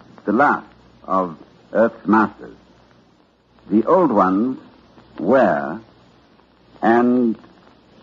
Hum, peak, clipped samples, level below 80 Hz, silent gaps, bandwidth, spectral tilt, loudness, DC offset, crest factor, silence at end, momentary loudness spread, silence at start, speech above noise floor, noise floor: none; -2 dBFS; under 0.1%; -60 dBFS; none; 7.2 kHz; -6.5 dB/octave; -18 LUFS; under 0.1%; 18 dB; 0.65 s; 11 LU; 0.25 s; 39 dB; -56 dBFS